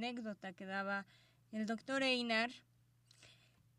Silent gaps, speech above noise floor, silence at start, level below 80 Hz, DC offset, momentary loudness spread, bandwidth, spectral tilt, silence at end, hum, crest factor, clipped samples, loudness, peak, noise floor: none; 30 dB; 0 s; -84 dBFS; under 0.1%; 14 LU; 12 kHz; -4 dB/octave; 0.45 s; 60 Hz at -75 dBFS; 20 dB; under 0.1%; -40 LUFS; -22 dBFS; -71 dBFS